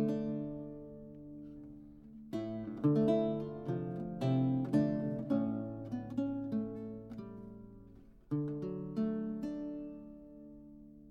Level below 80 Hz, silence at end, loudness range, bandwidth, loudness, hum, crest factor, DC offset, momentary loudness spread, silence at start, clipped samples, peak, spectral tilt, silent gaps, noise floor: -62 dBFS; 0 s; 7 LU; 8.2 kHz; -37 LUFS; none; 18 dB; under 0.1%; 22 LU; 0 s; under 0.1%; -20 dBFS; -10 dB/octave; none; -57 dBFS